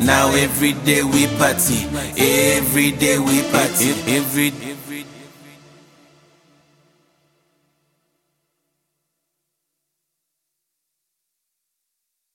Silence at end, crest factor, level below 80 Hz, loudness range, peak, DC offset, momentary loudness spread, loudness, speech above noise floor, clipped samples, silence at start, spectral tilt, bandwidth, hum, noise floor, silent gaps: 7.1 s; 22 dB; -46 dBFS; 11 LU; 0 dBFS; under 0.1%; 15 LU; -16 LUFS; 61 dB; under 0.1%; 0 s; -3.5 dB/octave; 17 kHz; none; -78 dBFS; none